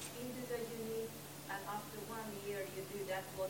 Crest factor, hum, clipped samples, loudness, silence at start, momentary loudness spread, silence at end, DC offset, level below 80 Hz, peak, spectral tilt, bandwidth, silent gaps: 14 dB; none; under 0.1%; -45 LUFS; 0 s; 3 LU; 0 s; under 0.1%; -74 dBFS; -30 dBFS; -4 dB/octave; 16.5 kHz; none